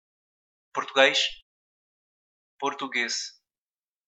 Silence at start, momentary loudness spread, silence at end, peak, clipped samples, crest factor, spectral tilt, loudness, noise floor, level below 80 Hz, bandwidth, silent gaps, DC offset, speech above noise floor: 0.75 s; 14 LU; 0.75 s; -4 dBFS; under 0.1%; 28 dB; -0.5 dB/octave; -25 LUFS; under -90 dBFS; -68 dBFS; 9 kHz; 1.42-2.59 s; under 0.1%; over 65 dB